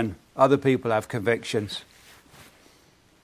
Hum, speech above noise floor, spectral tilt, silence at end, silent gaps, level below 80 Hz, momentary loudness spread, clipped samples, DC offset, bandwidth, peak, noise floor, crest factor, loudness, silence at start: none; 35 dB; -6 dB/octave; 1.4 s; none; -56 dBFS; 12 LU; under 0.1%; under 0.1%; 15.5 kHz; -4 dBFS; -59 dBFS; 22 dB; -24 LUFS; 0 s